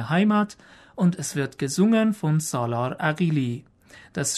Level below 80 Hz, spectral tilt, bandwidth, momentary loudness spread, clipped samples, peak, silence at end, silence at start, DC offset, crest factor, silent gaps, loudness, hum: -64 dBFS; -5.5 dB/octave; 13.5 kHz; 10 LU; under 0.1%; -8 dBFS; 0 s; 0 s; under 0.1%; 14 dB; none; -24 LUFS; none